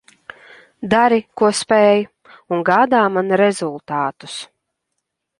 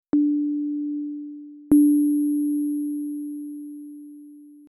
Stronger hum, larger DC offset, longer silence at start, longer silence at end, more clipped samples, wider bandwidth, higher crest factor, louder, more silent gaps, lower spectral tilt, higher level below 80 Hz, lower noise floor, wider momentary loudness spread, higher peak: neither; neither; first, 0.8 s vs 0.15 s; first, 0.95 s vs 0.2 s; neither; about the same, 11.5 kHz vs 11.5 kHz; about the same, 16 dB vs 16 dB; first, -16 LUFS vs -23 LUFS; neither; second, -4.5 dB/octave vs -8 dB/octave; about the same, -60 dBFS vs -60 dBFS; first, -76 dBFS vs -45 dBFS; second, 17 LU vs 21 LU; first, -2 dBFS vs -8 dBFS